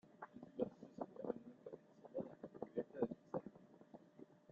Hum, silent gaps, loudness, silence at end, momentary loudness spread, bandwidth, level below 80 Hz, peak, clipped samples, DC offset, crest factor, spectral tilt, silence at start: none; none; -50 LUFS; 0 s; 18 LU; 7.4 kHz; -84 dBFS; -24 dBFS; under 0.1%; under 0.1%; 26 dB; -8 dB/octave; 0.05 s